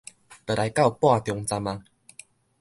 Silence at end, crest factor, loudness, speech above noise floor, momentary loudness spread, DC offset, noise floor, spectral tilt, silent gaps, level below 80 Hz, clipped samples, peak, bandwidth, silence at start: 0.8 s; 20 dB; -24 LUFS; 28 dB; 19 LU; under 0.1%; -52 dBFS; -5.5 dB/octave; none; -56 dBFS; under 0.1%; -6 dBFS; 12 kHz; 0.3 s